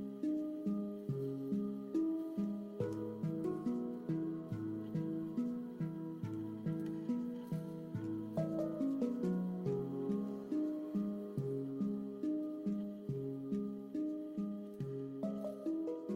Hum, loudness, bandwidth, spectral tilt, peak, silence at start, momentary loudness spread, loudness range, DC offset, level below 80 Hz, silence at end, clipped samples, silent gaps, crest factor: none; -41 LUFS; 15.5 kHz; -9.5 dB/octave; -26 dBFS; 0 s; 5 LU; 3 LU; under 0.1%; -74 dBFS; 0 s; under 0.1%; none; 14 dB